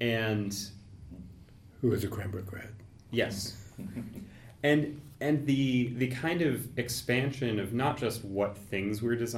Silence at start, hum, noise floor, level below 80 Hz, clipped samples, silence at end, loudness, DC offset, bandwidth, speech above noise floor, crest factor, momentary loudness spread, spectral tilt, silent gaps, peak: 0 s; none; -53 dBFS; -58 dBFS; under 0.1%; 0 s; -32 LUFS; under 0.1%; 16.5 kHz; 22 dB; 18 dB; 19 LU; -5.5 dB/octave; none; -14 dBFS